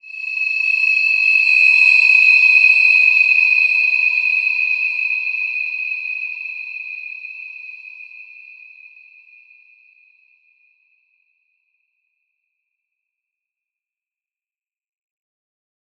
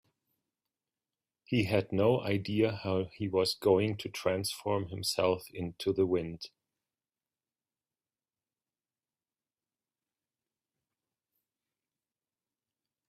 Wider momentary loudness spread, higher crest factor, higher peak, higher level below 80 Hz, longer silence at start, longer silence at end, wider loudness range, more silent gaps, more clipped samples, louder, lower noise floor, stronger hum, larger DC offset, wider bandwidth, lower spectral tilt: first, 21 LU vs 7 LU; about the same, 18 dB vs 22 dB; first, -2 dBFS vs -14 dBFS; second, under -90 dBFS vs -68 dBFS; second, 0.05 s vs 1.5 s; first, 7.5 s vs 6.6 s; first, 21 LU vs 7 LU; neither; neither; first, -12 LUFS vs -31 LUFS; about the same, under -90 dBFS vs under -90 dBFS; neither; neither; second, 8.6 kHz vs 15.5 kHz; second, 7.5 dB/octave vs -5.5 dB/octave